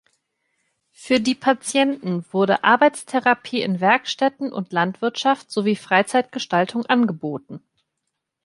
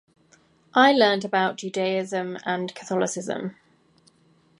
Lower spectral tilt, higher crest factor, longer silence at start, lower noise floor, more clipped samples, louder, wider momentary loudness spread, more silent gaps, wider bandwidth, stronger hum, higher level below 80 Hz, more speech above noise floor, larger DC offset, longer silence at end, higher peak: about the same, -4.5 dB/octave vs -4 dB/octave; about the same, 20 dB vs 22 dB; first, 1 s vs 0.75 s; first, -79 dBFS vs -61 dBFS; neither; first, -20 LUFS vs -23 LUFS; second, 8 LU vs 12 LU; neither; about the same, 11.5 kHz vs 11.5 kHz; neither; first, -68 dBFS vs -76 dBFS; first, 58 dB vs 38 dB; neither; second, 0.85 s vs 1.05 s; about the same, -2 dBFS vs -4 dBFS